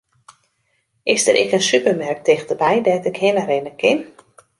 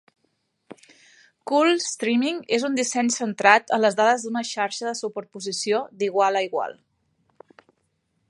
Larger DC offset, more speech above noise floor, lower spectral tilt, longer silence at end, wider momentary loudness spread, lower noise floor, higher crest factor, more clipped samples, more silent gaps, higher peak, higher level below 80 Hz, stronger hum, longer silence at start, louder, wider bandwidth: neither; about the same, 50 dB vs 50 dB; about the same, -3 dB/octave vs -2.5 dB/octave; second, 0.55 s vs 1.55 s; second, 5 LU vs 12 LU; second, -67 dBFS vs -72 dBFS; second, 18 dB vs 24 dB; neither; neither; about the same, 0 dBFS vs 0 dBFS; first, -64 dBFS vs -78 dBFS; neither; first, 1.05 s vs 0.7 s; first, -17 LUFS vs -22 LUFS; about the same, 11.5 kHz vs 11.5 kHz